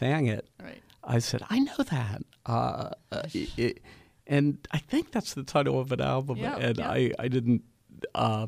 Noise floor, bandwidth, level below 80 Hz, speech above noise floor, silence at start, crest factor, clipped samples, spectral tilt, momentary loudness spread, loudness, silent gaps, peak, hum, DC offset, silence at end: -48 dBFS; 15 kHz; -54 dBFS; 19 dB; 0 s; 18 dB; under 0.1%; -6.5 dB/octave; 10 LU; -29 LUFS; none; -12 dBFS; none; under 0.1%; 0 s